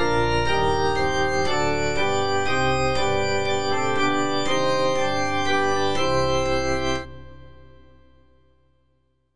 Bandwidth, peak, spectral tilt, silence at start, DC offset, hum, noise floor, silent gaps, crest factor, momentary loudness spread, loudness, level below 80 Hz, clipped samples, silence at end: 10.5 kHz; -10 dBFS; -4.5 dB/octave; 0 s; under 0.1%; none; -68 dBFS; none; 14 dB; 2 LU; -22 LUFS; -40 dBFS; under 0.1%; 0 s